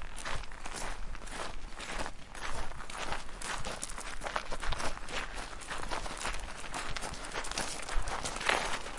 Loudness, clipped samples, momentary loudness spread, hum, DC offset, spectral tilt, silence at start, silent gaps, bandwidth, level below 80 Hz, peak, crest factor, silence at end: -38 LUFS; under 0.1%; 9 LU; none; under 0.1%; -2 dB/octave; 0 s; none; 11.5 kHz; -42 dBFS; -10 dBFS; 24 dB; 0 s